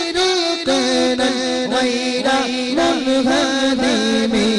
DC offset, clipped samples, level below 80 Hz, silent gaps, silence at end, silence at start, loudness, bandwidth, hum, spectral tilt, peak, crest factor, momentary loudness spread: under 0.1%; under 0.1%; -48 dBFS; none; 0 s; 0 s; -17 LUFS; 11.5 kHz; none; -3 dB/octave; -8 dBFS; 10 dB; 2 LU